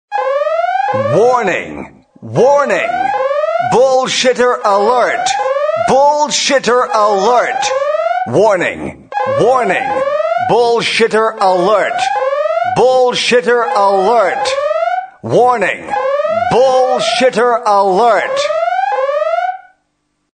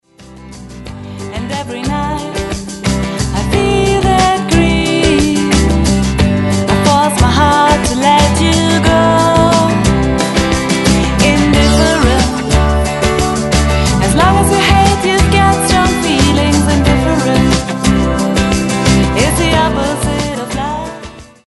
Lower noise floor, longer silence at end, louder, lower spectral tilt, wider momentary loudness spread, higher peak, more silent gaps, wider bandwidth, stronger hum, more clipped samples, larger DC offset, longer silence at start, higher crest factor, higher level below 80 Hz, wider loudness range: first, -65 dBFS vs -35 dBFS; first, 0.8 s vs 0.25 s; about the same, -12 LUFS vs -11 LUFS; second, -3.5 dB/octave vs -5 dB/octave; second, 5 LU vs 9 LU; about the same, 0 dBFS vs 0 dBFS; neither; second, 9.6 kHz vs 12 kHz; neither; neither; neither; about the same, 0.1 s vs 0.2 s; about the same, 12 dB vs 12 dB; second, -52 dBFS vs -20 dBFS; about the same, 2 LU vs 4 LU